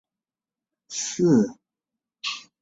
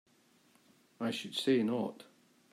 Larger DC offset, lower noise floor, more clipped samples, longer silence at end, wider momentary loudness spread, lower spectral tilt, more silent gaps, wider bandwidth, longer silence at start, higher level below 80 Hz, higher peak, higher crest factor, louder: neither; first, under -90 dBFS vs -68 dBFS; neither; second, 0.2 s vs 0.5 s; about the same, 13 LU vs 11 LU; about the same, -4.5 dB/octave vs -5 dB/octave; neither; second, 8 kHz vs 15.5 kHz; about the same, 0.9 s vs 1 s; first, -66 dBFS vs -84 dBFS; first, -8 dBFS vs -18 dBFS; about the same, 18 dB vs 20 dB; first, -24 LUFS vs -34 LUFS